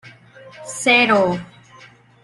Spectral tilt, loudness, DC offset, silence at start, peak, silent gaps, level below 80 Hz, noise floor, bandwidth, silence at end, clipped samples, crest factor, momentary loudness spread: -3.5 dB/octave; -16 LUFS; under 0.1%; 0.05 s; -2 dBFS; none; -60 dBFS; -47 dBFS; 12.5 kHz; 0.8 s; under 0.1%; 18 dB; 19 LU